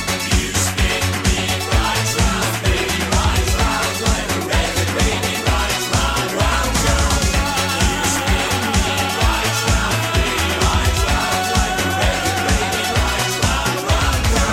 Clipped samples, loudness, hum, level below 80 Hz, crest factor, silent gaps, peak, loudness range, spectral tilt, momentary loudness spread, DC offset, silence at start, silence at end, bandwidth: under 0.1%; -17 LUFS; none; -24 dBFS; 16 dB; none; -2 dBFS; 1 LU; -3.5 dB/octave; 2 LU; under 0.1%; 0 s; 0 s; 16.5 kHz